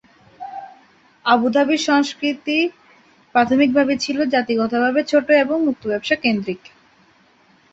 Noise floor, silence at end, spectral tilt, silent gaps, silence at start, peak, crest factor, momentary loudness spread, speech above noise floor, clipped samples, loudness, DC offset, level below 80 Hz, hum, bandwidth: -55 dBFS; 1.15 s; -4 dB/octave; none; 0.4 s; -2 dBFS; 18 dB; 15 LU; 37 dB; under 0.1%; -18 LUFS; under 0.1%; -60 dBFS; none; 8 kHz